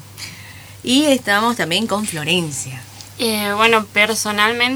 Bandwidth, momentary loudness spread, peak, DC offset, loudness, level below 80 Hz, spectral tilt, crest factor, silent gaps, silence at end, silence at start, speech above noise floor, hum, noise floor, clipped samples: over 20 kHz; 18 LU; 0 dBFS; under 0.1%; -16 LUFS; -56 dBFS; -3 dB/octave; 18 dB; none; 0 s; 0 s; 20 dB; none; -37 dBFS; under 0.1%